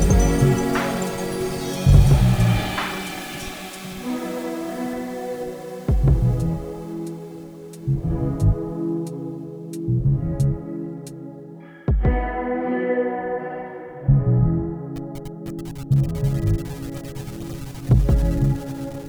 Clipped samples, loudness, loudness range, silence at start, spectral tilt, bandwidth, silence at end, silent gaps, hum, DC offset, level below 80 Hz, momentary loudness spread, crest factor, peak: under 0.1%; -23 LUFS; 6 LU; 0 s; -7 dB/octave; over 20 kHz; 0 s; none; none; under 0.1%; -28 dBFS; 15 LU; 20 dB; -2 dBFS